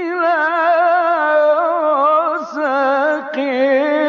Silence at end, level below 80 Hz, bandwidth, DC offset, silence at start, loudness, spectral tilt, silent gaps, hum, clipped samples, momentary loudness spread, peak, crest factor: 0 s; -82 dBFS; 7 kHz; under 0.1%; 0 s; -15 LUFS; -4 dB/octave; none; none; under 0.1%; 6 LU; -4 dBFS; 10 dB